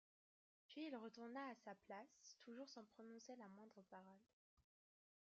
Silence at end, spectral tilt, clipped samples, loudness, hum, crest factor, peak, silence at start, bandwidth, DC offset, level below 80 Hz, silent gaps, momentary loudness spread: 0.65 s; -3 dB/octave; under 0.1%; -59 LUFS; none; 18 dB; -42 dBFS; 0.7 s; 7.2 kHz; under 0.1%; under -90 dBFS; 4.33-4.57 s; 10 LU